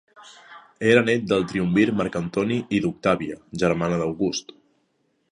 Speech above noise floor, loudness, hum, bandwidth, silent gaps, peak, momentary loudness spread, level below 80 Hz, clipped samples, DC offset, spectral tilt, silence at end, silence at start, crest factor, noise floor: 47 dB; -23 LUFS; none; 10.5 kHz; none; -2 dBFS; 7 LU; -54 dBFS; under 0.1%; under 0.1%; -6 dB/octave; 0.9 s; 0.2 s; 20 dB; -69 dBFS